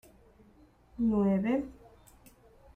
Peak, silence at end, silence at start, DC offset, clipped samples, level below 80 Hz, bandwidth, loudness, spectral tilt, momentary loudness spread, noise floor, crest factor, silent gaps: -18 dBFS; 1 s; 1 s; under 0.1%; under 0.1%; -56 dBFS; 15.5 kHz; -30 LUFS; -9 dB/octave; 18 LU; -61 dBFS; 16 dB; none